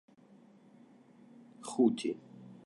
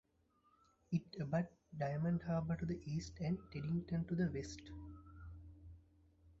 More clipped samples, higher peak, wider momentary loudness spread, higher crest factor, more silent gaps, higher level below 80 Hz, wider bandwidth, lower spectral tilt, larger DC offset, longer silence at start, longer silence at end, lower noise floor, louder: neither; first, -14 dBFS vs -26 dBFS; about the same, 19 LU vs 17 LU; first, 22 dB vs 16 dB; neither; second, -88 dBFS vs -60 dBFS; first, 11 kHz vs 7.6 kHz; second, -5.5 dB/octave vs -8 dB/octave; neither; first, 1.6 s vs 0.9 s; about the same, 0.1 s vs 0.1 s; second, -61 dBFS vs -76 dBFS; first, -33 LUFS vs -42 LUFS